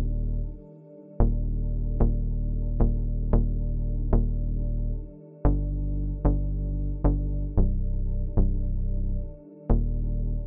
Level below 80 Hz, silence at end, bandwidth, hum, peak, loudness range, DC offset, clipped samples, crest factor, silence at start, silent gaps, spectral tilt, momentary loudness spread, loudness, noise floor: -26 dBFS; 0 s; 1.9 kHz; none; -8 dBFS; 1 LU; under 0.1%; under 0.1%; 16 dB; 0 s; none; -13.5 dB/octave; 8 LU; -29 LUFS; -47 dBFS